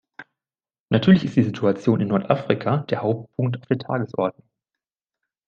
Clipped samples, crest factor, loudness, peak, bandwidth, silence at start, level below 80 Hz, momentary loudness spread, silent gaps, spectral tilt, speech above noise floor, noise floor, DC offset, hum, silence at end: under 0.1%; 20 dB; -22 LUFS; -2 dBFS; 7 kHz; 0.2 s; -60 dBFS; 9 LU; 0.80-0.86 s; -8.5 dB/octave; over 69 dB; under -90 dBFS; under 0.1%; none; 1.15 s